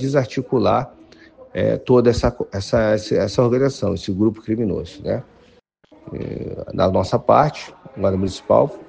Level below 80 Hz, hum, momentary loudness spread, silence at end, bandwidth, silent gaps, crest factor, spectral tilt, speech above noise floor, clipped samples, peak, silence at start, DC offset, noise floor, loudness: -42 dBFS; none; 13 LU; 0.05 s; 9.4 kHz; none; 18 dB; -7 dB/octave; 35 dB; under 0.1%; 0 dBFS; 0 s; under 0.1%; -54 dBFS; -19 LUFS